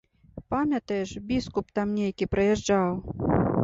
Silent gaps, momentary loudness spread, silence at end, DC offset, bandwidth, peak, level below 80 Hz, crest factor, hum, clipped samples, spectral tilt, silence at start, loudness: none; 7 LU; 0 s; under 0.1%; 8 kHz; -10 dBFS; -46 dBFS; 16 dB; none; under 0.1%; -6.5 dB/octave; 0.35 s; -27 LUFS